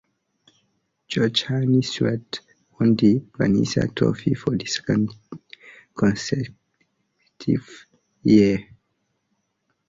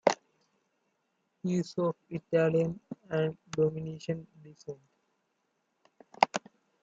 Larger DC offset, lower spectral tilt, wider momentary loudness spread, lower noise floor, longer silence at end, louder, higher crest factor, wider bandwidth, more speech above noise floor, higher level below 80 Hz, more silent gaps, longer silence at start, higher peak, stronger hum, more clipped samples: neither; about the same, -6 dB/octave vs -6 dB/octave; about the same, 16 LU vs 18 LU; second, -73 dBFS vs -78 dBFS; first, 1.25 s vs 0.45 s; first, -22 LUFS vs -32 LUFS; second, 20 dB vs 30 dB; about the same, 7.8 kHz vs 7.8 kHz; first, 53 dB vs 47 dB; first, -54 dBFS vs -74 dBFS; neither; first, 1.1 s vs 0.05 s; about the same, -4 dBFS vs -4 dBFS; neither; neither